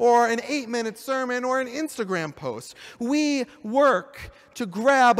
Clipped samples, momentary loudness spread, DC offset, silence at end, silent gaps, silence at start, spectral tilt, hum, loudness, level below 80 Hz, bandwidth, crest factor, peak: under 0.1%; 15 LU; under 0.1%; 0 s; none; 0 s; -4 dB/octave; none; -24 LUFS; -60 dBFS; 15.5 kHz; 16 dB; -8 dBFS